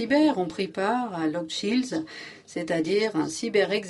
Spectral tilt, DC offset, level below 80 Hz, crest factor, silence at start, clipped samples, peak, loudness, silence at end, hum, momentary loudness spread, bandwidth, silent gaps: -4.5 dB/octave; under 0.1%; -68 dBFS; 16 dB; 0 s; under 0.1%; -10 dBFS; -26 LUFS; 0 s; none; 11 LU; 11.5 kHz; none